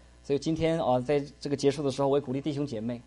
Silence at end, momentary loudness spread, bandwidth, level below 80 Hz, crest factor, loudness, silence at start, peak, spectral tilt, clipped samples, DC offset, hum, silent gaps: 0.05 s; 6 LU; 11.5 kHz; -54 dBFS; 16 dB; -29 LUFS; 0.25 s; -14 dBFS; -6.5 dB/octave; under 0.1%; under 0.1%; none; none